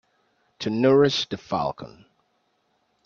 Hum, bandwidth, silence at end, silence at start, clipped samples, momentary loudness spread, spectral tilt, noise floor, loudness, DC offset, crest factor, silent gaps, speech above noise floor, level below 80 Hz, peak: none; 7.2 kHz; 1.2 s; 0.6 s; under 0.1%; 18 LU; -5.5 dB/octave; -70 dBFS; -23 LUFS; under 0.1%; 20 dB; none; 48 dB; -60 dBFS; -6 dBFS